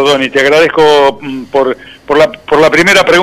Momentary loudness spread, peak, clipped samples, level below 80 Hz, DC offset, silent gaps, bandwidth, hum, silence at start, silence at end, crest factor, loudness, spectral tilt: 9 LU; 0 dBFS; under 0.1%; -42 dBFS; under 0.1%; none; 15.5 kHz; none; 0 s; 0 s; 8 dB; -8 LUFS; -3.5 dB/octave